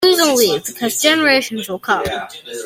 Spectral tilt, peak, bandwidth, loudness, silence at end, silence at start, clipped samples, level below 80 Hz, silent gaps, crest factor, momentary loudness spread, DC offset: -2 dB/octave; 0 dBFS; 16.5 kHz; -15 LUFS; 0 s; 0 s; under 0.1%; -52 dBFS; none; 16 dB; 12 LU; under 0.1%